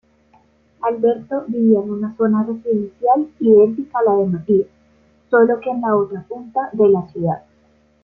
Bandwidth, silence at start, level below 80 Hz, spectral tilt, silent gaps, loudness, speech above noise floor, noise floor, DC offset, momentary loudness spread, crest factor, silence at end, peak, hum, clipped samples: 3.4 kHz; 0.8 s; -60 dBFS; -11 dB/octave; none; -17 LUFS; 39 dB; -56 dBFS; under 0.1%; 10 LU; 16 dB; 0.65 s; -2 dBFS; none; under 0.1%